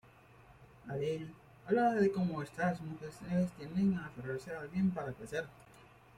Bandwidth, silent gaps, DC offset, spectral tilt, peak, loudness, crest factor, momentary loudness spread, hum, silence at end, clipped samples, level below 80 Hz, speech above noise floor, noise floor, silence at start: 12 kHz; none; under 0.1%; -7.5 dB/octave; -18 dBFS; -36 LUFS; 18 dB; 14 LU; none; 0.3 s; under 0.1%; -66 dBFS; 25 dB; -60 dBFS; 0.5 s